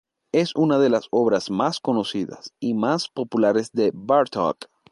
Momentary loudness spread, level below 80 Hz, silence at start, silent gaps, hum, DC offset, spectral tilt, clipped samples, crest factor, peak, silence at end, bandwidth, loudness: 8 LU; -66 dBFS; 0.35 s; none; none; under 0.1%; -6 dB/octave; under 0.1%; 16 dB; -6 dBFS; 0.25 s; 11.5 kHz; -22 LUFS